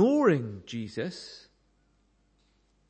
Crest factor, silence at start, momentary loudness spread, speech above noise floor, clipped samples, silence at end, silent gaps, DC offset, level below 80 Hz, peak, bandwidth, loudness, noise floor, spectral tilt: 20 dB; 0 s; 21 LU; 36 dB; under 0.1%; 1.5 s; none; under 0.1%; -70 dBFS; -10 dBFS; 8.8 kHz; -29 LUFS; -68 dBFS; -7 dB/octave